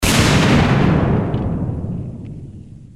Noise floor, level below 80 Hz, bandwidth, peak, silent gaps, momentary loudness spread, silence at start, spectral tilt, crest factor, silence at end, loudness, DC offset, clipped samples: -36 dBFS; -30 dBFS; 16 kHz; 0 dBFS; none; 20 LU; 0 s; -5.5 dB/octave; 16 dB; 0.05 s; -16 LUFS; under 0.1%; under 0.1%